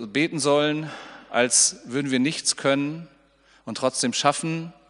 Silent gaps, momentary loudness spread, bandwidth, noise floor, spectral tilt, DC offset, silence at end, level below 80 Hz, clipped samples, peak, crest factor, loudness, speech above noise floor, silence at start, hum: none; 17 LU; 11 kHz; -58 dBFS; -3 dB/octave; under 0.1%; 0.15 s; -68 dBFS; under 0.1%; -2 dBFS; 22 dB; -22 LUFS; 34 dB; 0 s; none